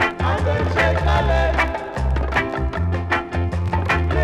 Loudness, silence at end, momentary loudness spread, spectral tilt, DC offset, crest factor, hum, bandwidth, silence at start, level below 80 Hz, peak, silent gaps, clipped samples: -20 LUFS; 0 s; 5 LU; -6.5 dB/octave; under 0.1%; 12 dB; none; 10 kHz; 0 s; -24 dBFS; -8 dBFS; none; under 0.1%